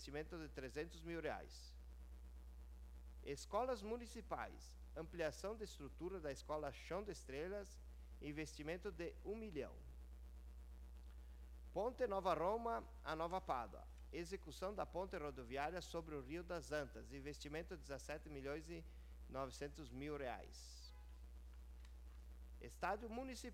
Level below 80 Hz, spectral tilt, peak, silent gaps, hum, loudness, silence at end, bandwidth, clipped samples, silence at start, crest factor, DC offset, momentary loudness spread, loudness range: -58 dBFS; -5 dB/octave; -26 dBFS; none; none; -49 LUFS; 0 s; 16 kHz; under 0.1%; 0 s; 22 dB; under 0.1%; 16 LU; 7 LU